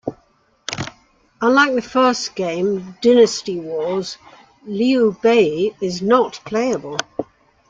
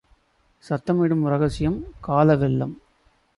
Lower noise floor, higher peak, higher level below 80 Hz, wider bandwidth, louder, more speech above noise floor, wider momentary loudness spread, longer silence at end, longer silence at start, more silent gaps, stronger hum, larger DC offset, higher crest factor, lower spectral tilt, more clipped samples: second, -58 dBFS vs -62 dBFS; first, -2 dBFS vs -6 dBFS; second, -58 dBFS vs -44 dBFS; second, 7.8 kHz vs 11.5 kHz; first, -18 LUFS vs -22 LUFS; about the same, 41 dB vs 41 dB; first, 16 LU vs 11 LU; second, 0.45 s vs 0.65 s; second, 0.05 s vs 0.7 s; neither; neither; neither; about the same, 16 dB vs 18 dB; second, -4.5 dB/octave vs -9 dB/octave; neither